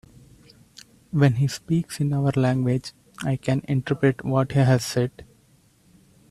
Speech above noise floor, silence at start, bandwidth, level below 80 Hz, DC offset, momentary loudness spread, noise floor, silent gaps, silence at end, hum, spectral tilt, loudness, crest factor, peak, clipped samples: 37 dB; 1.15 s; 13.5 kHz; -54 dBFS; under 0.1%; 8 LU; -59 dBFS; none; 1.1 s; none; -7 dB/octave; -23 LUFS; 18 dB; -6 dBFS; under 0.1%